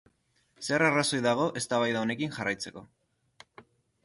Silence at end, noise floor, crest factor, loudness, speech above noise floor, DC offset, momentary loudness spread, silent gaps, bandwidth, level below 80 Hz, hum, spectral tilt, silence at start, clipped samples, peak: 0.45 s; -70 dBFS; 20 dB; -28 LUFS; 42 dB; under 0.1%; 10 LU; none; 11.5 kHz; -68 dBFS; none; -4 dB/octave; 0.6 s; under 0.1%; -10 dBFS